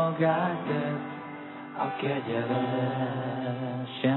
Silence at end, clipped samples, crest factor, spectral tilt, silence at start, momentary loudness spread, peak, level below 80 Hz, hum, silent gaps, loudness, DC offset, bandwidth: 0 s; under 0.1%; 16 dB; -10.5 dB/octave; 0 s; 13 LU; -14 dBFS; -78 dBFS; none; none; -30 LUFS; under 0.1%; 4.2 kHz